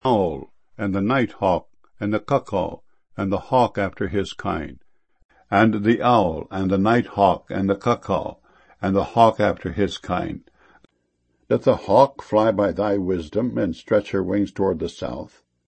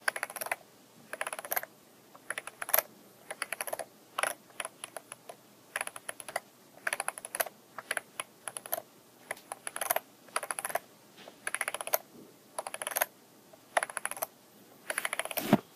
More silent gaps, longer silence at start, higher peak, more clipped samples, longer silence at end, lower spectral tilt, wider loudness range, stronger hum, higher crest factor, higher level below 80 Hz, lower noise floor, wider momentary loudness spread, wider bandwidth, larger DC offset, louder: first, 5.25-5.29 s vs none; about the same, 0.05 s vs 0 s; first, 0 dBFS vs -6 dBFS; neither; first, 0.4 s vs 0 s; first, -7.5 dB/octave vs -2.5 dB/octave; about the same, 4 LU vs 3 LU; neither; second, 22 dB vs 32 dB; first, -48 dBFS vs -82 dBFS; first, -69 dBFS vs -58 dBFS; second, 12 LU vs 17 LU; second, 8.6 kHz vs 15.5 kHz; neither; first, -21 LUFS vs -36 LUFS